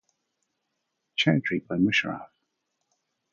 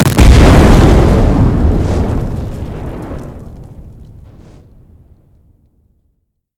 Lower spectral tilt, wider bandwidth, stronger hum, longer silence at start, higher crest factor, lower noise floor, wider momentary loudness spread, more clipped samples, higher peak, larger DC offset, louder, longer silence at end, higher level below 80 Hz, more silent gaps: second, -5.5 dB/octave vs -7 dB/octave; second, 7.4 kHz vs 17 kHz; neither; first, 1.2 s vs 0 s; first, 22 dB vs 12 dB; first, -80 dBFS vs -63 dBFS; second, 11 LU vs 21 LU; second, under 0.1% vs 3%; second, -8 dBFS vs 0 dBFS; neither; second, -25 LUFS vs -9 LUFS; second, 1.1 s vs 2.7 s; second, -62 dBFS vs -14 dBFS; neither